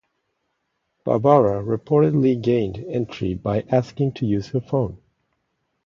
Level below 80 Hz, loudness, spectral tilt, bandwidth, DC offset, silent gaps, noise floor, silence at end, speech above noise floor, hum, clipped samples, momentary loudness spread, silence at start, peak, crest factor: -50 dBFS; -21 LUFS; -9 dB/octave; 7.2 kHz; under 0.1%; none; -74 dBFS; 0.9 s; 54 dB; none; under 0.1%; 10 LU; 1.05 s; -2 dBFS; 20 dB